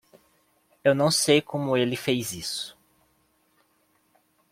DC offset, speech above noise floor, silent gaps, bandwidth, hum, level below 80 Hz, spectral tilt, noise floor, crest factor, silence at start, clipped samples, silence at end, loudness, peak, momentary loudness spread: under 0.1%; 43 dB; none; 16.5 kHz; none; -66 dBFS; -4 dB/octave; -67 dBFS; 22 dB; 0.85 s; under 0.1%; 1.8 s; -24 LUFS; -6 dBFS; 11 LU